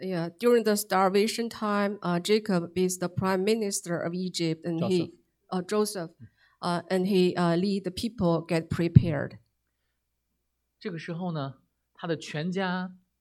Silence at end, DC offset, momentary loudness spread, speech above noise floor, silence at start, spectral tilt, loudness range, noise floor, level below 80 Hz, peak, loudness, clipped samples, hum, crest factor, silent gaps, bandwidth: 0.25 s; under 0.1%; 12 LU; 52 dB; 0 s; -5.5 dB/octave; 8 LU; -79 dBFS; -54 dBFS; -2 dBFS; -28 LUFS; under 0.1%; none; 26 dB; none; 16 kHz